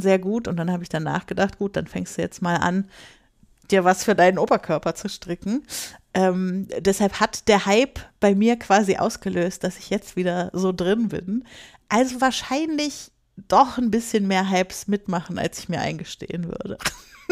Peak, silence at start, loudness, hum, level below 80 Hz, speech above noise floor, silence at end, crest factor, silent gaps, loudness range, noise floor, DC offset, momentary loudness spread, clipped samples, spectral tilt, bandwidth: -4 dBFS; 0 s; -23 LUFS; none; -52 dBFS; 34 dB; 0.3 s; 18 dB; none; 4 LU; -57 dBFS; under 0.1%; 12 LU; under 0.1%; -5 dB/octave; 15.5 kHz